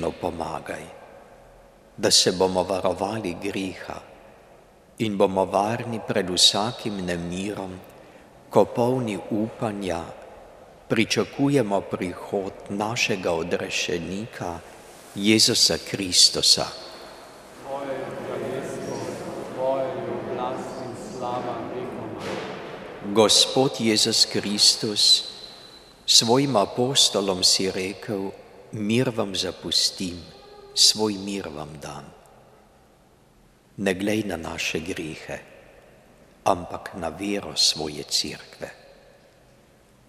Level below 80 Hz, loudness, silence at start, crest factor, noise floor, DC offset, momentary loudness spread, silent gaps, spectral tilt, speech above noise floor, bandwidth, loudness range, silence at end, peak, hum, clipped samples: -58 dBFS; -22 LUFS; 0 s; 24 dB; -56 dBFS; under 0.1%; 19 LU; none; -2.5 dB/octave; 33 dB; 15.5 kHz; 11 LU; 1.35 s; -2 dBFS; none; under 0.1%